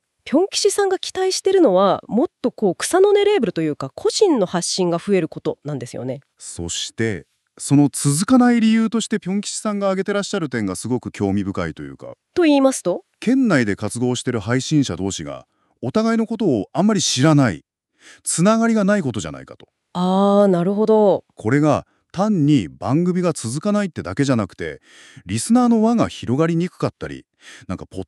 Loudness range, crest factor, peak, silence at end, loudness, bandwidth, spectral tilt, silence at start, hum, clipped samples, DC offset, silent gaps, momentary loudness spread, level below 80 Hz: 4 LU; 16 dB; -2 dBFS; 0.05 s; -19 LUFS; 13 kHz; -5.5 dB/octave; 0.25 s; none; under 0.1%; under 0.1%; none; 14 LU; -54 dBFS